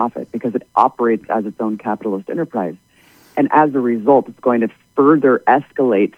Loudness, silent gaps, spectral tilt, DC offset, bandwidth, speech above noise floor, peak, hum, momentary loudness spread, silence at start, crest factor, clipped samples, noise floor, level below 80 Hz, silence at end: -17 LUFS; none; -8.5 dB/octave; under 0.1%; 7.4 kHz; 34 dB; 0 dBFS; none; 9 LU; 0 s; 16 dB; under 0.1%; -50 dBFS; -66 dBFS; 0.1 s